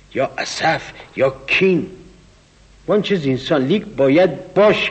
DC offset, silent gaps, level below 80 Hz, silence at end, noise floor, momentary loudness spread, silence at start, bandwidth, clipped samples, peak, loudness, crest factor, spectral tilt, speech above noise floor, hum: under 0.1%; none; -50 dBFS; 0 s; -49 dBFS; 9 LU; 0.15 s; 8.4 kHz; under 0.1%; -4 dBFS; -17 LUFS; 14 dB; -5.5 dB/octave; 32 dB; none